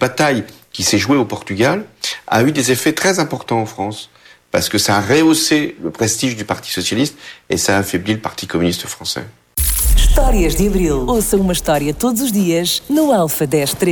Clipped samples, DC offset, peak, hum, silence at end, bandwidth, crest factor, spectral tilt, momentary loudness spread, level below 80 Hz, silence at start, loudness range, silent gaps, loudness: under 0.1%; under 0.1%; -2 dBFS; none; 0 s; over 20 kHz; 14 dB; -4 dB/octave; 9 LU; -24 dBFS; 0 s; 3 LU; none; -16 LUFS